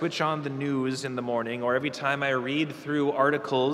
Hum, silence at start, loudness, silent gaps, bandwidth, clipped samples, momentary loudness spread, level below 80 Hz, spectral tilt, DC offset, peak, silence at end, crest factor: none; 0 s; -27 LUFS; none; 13.5 kHz; under 0.1%; 5 LU; -72 dBFS; -5.5 dB/octave; under 0.1%; -10 dBFS; 0 s; 18 dB